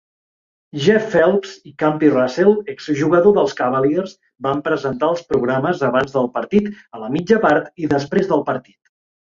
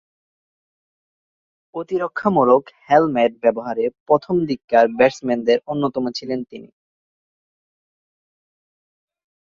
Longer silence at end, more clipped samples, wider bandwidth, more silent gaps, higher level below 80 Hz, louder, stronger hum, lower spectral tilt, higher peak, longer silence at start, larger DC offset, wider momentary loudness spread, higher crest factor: second, 0.65 s vs 2.9 s; neither; about the same, 7.4 kHz vs 7.4 kHz; second, none vs 4.00-4.06 s, 4.64-4.68 s; first, -54 dBFS vs -62 dBFS; about the same, -17 LUFS vs -19 LUFS; neither; about the same, -6.5 dB/octave vs -6.5 dB/octave; about the same, -2 dBFS vs -2 dBFS; second, 0.75 s vs 1.75 s; neither; about the same, 10 LU vs 11 LU; about the same, 16 dB vs 20 dB